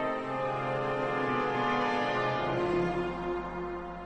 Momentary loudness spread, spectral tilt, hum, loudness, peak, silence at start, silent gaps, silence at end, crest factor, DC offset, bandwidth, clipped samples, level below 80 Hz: 6 LU; -6.5 dB/octave; none; -31 LUFS; -18 dBFS; 0 s; none; 0 s; 14 dB; 0.1%; 9 kHz; under 0.1%; -54 dBFS